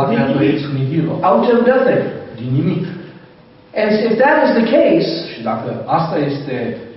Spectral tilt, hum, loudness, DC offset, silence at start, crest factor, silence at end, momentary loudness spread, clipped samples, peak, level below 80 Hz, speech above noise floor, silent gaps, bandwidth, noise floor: -5.5 dB/octave; none; -15 LUFS; under 0.1%; 0 s; 14 dB; 0 s; 10 LU; under 0.1%; -2 dBFS; -54 dBFS; 29 dB; none; 6 kHz; -43 dBFS